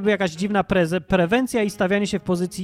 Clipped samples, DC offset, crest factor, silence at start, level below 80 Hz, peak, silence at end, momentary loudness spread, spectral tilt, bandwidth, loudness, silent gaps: under 0.1%; under 0.1%; 16 dB; 0 s; -46 dBFS; -4 dBFS; 0 s; 4 LU; -6 dB/octave; 15 kHz; -21 LUFS; none